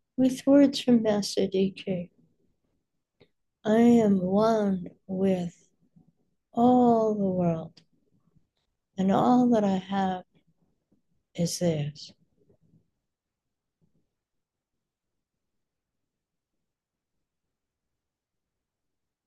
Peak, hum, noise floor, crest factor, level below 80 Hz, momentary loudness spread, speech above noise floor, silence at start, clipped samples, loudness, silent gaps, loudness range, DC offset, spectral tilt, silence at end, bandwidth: -10 dBFS; none; -87 dBFS; 18 dB; -66 dBFS; 16 LU; 63 dB; 0.2 s; under 0.1%; -25 LUFS; none; 9 LU; under 0.1%; -6.5 dB/octave; 7.2 s; 12.5 kHz